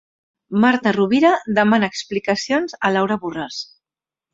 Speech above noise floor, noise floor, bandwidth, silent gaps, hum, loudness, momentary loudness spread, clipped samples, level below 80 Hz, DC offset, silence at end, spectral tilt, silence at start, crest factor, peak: over 72 dB; under -90 dBFS; 7.8 kHz; none; none; -18 LUFS; 12 LU; under 0.1%; -60 dBFS; under 0.1%; 0.7 s; -5 dB/octave; 0.5 s; 18 dB; -2 dBFS